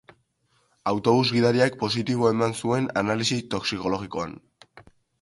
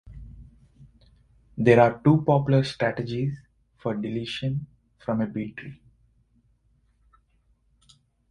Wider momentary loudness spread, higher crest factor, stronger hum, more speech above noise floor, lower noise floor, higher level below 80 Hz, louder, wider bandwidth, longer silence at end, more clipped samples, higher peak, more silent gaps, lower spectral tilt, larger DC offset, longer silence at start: second, 10 LU vs 25 LU; second, 18 dB vs 24 dB; neither; about the same, 44 dB vs 43 dB; about the same, -68 dBFS vs -66 dBFS; about the same, -58 dBFS vs -54 dBFS; about the same, -24 LUFS vs -24 LUFS; about the same, 11.5 kHz vs 10.5 kHz; second, 0.4 s vs 2.55 s; neither; second, -6 dBFS vs -2 dBFS; neither; second, -5 dB/octave vs -8 dB/octave; neither; first, 0.85 s vs 0.05 s